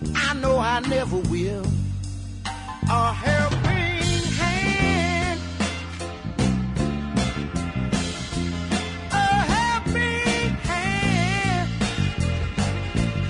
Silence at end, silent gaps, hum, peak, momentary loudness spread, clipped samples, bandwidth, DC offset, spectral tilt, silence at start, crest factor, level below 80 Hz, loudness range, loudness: 0 s; none; none; -10 dBFS; 7 LU; under 0.1%; 11 kHz; under 0.1%; -5 dB/octave; 0 s; 14 dB; -36 dBFS; 3 LU; -23 LUFS